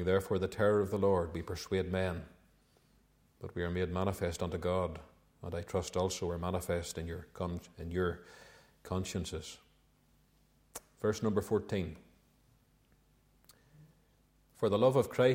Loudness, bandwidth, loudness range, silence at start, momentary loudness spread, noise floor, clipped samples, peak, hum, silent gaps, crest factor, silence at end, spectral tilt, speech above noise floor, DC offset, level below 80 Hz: -35 LUFS; 16.5 kHz; 6 LU; 0 s; 19 LU; -69 dBFS; under 0.1%; -14 dBFS; none; none; 22 dB; 0 s; -6 dB/octave; 35 dB; under 0.1%; -56 dBFS